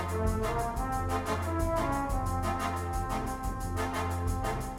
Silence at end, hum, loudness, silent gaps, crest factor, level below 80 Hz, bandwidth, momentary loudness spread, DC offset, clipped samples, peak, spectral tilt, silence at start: 0 s; none; -32 LUFS; none; 14 dB; -38 dBFS; 16 kHz; 4 LU; under 0.1%; under 0.1%; -18 dBFS; -6 dB/octave; 0 s